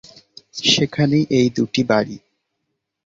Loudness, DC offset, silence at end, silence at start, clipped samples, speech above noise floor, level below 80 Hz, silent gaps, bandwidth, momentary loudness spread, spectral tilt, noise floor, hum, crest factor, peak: -18 LUFS; under 0.1%; 0.9 s; 0.55 s; under 0.1%; 59 dB; -56 dBFS; none; 7.8 kHz; 13 LU; -4.5 dB/octave; -76 dBFS; none; 18 dB; -2 dBFS